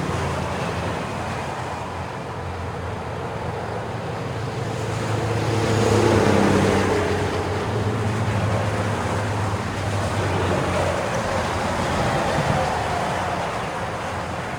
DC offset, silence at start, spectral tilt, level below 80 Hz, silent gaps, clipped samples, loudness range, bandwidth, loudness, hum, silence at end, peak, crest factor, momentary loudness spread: under 0.1%; 0 s; -5.5 dB/octave; -40 dBFS; none; under 0.1%; 8 LU; 17.5 kHz; -23 LUFS; none; 0 s; -4 dBFS; 18 dB; 11 LU